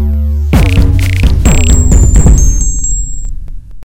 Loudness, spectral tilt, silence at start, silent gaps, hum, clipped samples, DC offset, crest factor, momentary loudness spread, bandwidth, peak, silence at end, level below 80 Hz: -9 LUFS; -5 dB/octave; 0 s; none; none; 4%; under 0.1%; 8 dB; 13 LU; 16 kHz; 0 dBFS; 0 s; -10 dBFS